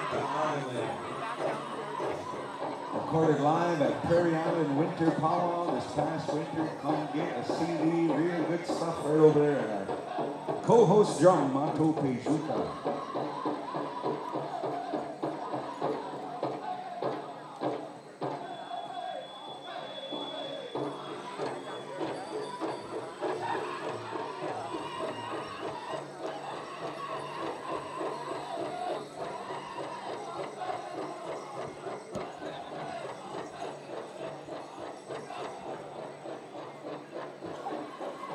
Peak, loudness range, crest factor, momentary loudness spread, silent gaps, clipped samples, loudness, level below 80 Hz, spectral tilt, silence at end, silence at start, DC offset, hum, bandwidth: -10 dBFS; 13 LU; 22 dB; 14 LU; none; under 0.1%; -32 LUFS; -76 dBFS; -6 dB/octave; 0 s; 0 s; under 0.1%; none; 12 kHz